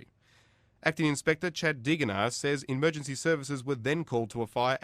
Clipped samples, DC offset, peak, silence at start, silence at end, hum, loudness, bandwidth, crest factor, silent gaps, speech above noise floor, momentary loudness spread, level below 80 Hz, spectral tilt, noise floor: under 0.1%; under 0.1%; -10 dBFS; 0.85 s; 0.05 s; none; -30 LUFS; 15 kHz; 20 dB; none; 35 dB; 4 LU; -64 dBFS; -5 dB/octave; -64 dBFS